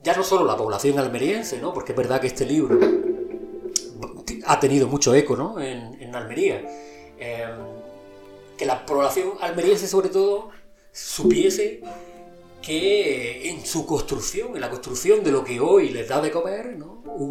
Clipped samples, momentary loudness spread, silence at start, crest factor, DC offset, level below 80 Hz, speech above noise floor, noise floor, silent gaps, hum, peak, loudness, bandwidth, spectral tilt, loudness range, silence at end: under 0.1%; 18 LU; 0.05 s; 20 dB; 0.1%; -50 dBFS; 23 dB; -45 dBFS; none; none; -2 dBFS; -22 LUFS; 16 kHz; -4.5 dB/octave; 5 LU; 0 s